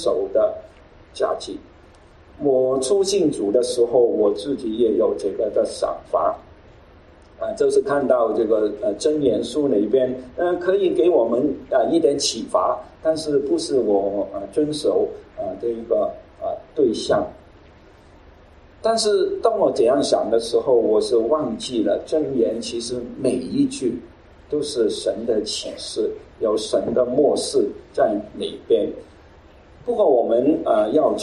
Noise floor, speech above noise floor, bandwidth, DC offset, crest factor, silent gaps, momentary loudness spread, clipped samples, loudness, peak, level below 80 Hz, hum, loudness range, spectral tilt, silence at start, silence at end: -48 dBFS; 28 dB; 12 kHz; under 0.1%; 18 dB; none; 10 LU; under 0.1%; -21 LUFS; -2 dBFS; -52 dBFS; none; 4 LU; -4.5 dB/octave; 0 s; 0 s